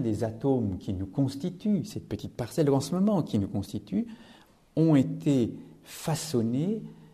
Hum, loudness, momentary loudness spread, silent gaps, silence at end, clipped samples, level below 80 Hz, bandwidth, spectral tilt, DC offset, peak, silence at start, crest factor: none; -29 LUFS; 12 LU; none; 0.1 s; under 0.1%; -60 dBFS; 14 kHz; -7 dB/octave; under 0.1%; -12 dBFS; 0 s; 16 dB